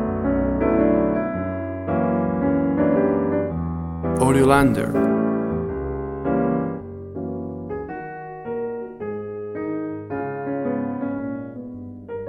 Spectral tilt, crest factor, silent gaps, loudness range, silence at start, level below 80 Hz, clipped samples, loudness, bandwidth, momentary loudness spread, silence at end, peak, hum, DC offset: -7.5 dB/octave; 20 dB; none; 10 LU; 0 s; -40 dBFS; under 0.1%; -23 LUFS; 13.5 kHz; 13 LU; 0 s; -2 dBFS; none; under 0.1%